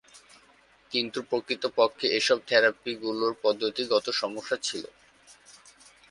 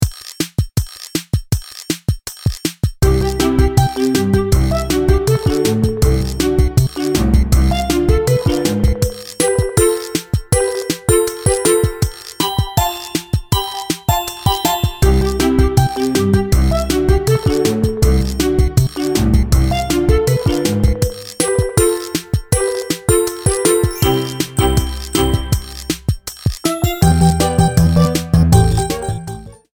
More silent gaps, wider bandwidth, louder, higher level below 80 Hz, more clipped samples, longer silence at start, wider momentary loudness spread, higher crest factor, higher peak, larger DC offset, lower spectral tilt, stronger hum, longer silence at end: neither; second, 11.5 kHz vs over 20 kHz; second, -27 LUFS vs -16 LUFS; second, -72 dBFS vs -22 dBFS; neither; first, 0.15 s vs 0 s; about the same, 9 LU vs 8 LU; first, 20 dB vs 14 dB; second, -8 dBFS vs 0 dBFS; neither; second, -2 dB/octave vs -5.5 dB/octave; neither; first, 0.6 s vs 0.25 s